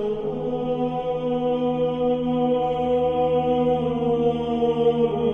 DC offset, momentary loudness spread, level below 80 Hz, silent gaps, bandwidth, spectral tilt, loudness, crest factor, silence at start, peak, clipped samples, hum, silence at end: under 0.1%; 5 LU; -48 dBFS; none; 3.8 kHz; -9 dB/octave; -23 LUFS; 12 dB; 0 s; -10 dBFS; under 0.1%; none; 0 s